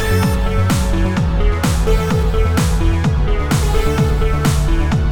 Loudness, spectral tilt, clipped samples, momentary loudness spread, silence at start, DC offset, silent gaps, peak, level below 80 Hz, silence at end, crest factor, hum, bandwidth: -16 LUFS; -6 dB/octave; under 0.1%; 1 LU; 0 s; under 0.1%; none; -2 dBFS; -18 dBFS; 0 s; 12 dB; none; 18.5 kHz